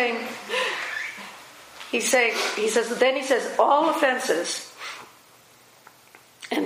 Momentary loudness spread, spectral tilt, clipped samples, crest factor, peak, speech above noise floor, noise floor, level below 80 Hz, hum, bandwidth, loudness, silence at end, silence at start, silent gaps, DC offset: 20 LU; -1.5 dB/octave; under 0.1%; 20 dB; -6 dBFS; 31 dB; -53 dBFS; -78 dBFS; none; 15.5 kHz; -23 LUFS; 0 s; 0 s; none; under 0.1%